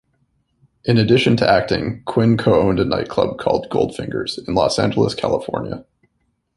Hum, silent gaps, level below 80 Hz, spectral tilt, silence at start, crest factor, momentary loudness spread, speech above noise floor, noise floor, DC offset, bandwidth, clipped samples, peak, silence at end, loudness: none; none; -44 dBFS; -6.5 dB/octave; 0.85 s; 18 dB; 10 LU; 51 dB; -68 dBFS; under 0.1%; 11.5 kHz; under 0.1%; 0 dBFS; 0.75 s; -18 LUFS